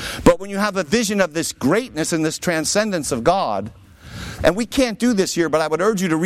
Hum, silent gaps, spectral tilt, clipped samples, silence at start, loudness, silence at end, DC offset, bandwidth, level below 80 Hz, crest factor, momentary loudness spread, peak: none; none; -4 dB/octave; under 0.1%; 0 s; -19 LUFS; 0 s; under 0.1%; 16 kHz; -40 dBFS; 18 dB; 5 LU; -2 dBFS